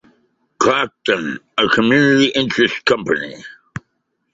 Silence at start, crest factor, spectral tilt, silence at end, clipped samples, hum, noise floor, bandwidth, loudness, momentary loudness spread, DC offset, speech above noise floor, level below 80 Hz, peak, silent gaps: 0.6 s; 16 dB; -4.5 dB/octave; 0.8 s; under 0.1%; none; -70 dBFS; 7.8 kHz; -16 LUFS; 21 LU; under 0.1%; 54 dB; -54 dBFS; 0 dBFS; none